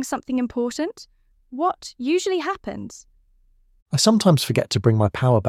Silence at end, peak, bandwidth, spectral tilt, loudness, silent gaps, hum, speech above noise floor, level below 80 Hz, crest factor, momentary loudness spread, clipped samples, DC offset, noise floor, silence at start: 0 s; -2 dBFS; 16 kHz; -5.5 dB/octave; -21 LUFS; 3.82-3.86 s; none; 37 dB; -54 dBFS; 20 dB; 13 LU; under 0.1%; under 0.1%; -58 dBFS; 0 s